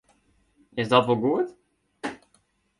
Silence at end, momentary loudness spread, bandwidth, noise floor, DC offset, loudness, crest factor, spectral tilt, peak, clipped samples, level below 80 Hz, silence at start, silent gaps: 0.65 s; 16 LU; 11.5 kHz; -67 dBFS; under 0.1%; -25 LUFS; 24 dB; -6.5 dB/octave; -4 dBFS; under 0.1%; -66 dBFS; 0.75 s; none